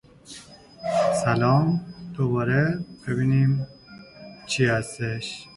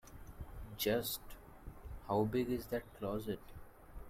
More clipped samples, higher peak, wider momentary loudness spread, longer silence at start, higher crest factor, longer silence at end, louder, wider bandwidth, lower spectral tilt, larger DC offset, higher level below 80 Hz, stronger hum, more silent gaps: neither; first, -8 dBFS vs -22 dBFS; about the same, 22 LU vs 21 LU; first, 0.3 s vs 0.05 s; about the same, 18 dB vs 18 dB; about the same, 0.1 s vs 0 s; first, -24 LUFS vs -39 LUFS; second, 11.5 kHz vs 16.5 kHz; first, -6.5 dB/octave vs -5 dB/octave; neither; about the same, -54 dBFS vs -54 dBFS; neither; neither